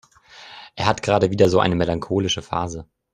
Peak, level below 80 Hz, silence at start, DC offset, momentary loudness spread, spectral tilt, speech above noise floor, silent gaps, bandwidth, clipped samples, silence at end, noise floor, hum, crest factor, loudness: -2 dBFS; -48 dBFS; 0.35 s; under 0.1%; 21 LU; -5.5 dB/octave; 26 dB; none; 12 kHz; under 0.1%; 0.3 s; -45 dBFS; none; 20 dB; -20 LUFS